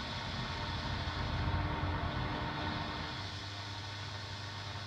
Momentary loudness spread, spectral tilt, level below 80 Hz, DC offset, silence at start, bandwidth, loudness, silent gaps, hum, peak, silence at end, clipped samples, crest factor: 6 LU; -5 dB/octave; -48 dBFS; under 0.1%; 0 s; 10 kHz; -38 LUFS; none; none; -22 dBFS; 0 s; under 0.1%; 16 dB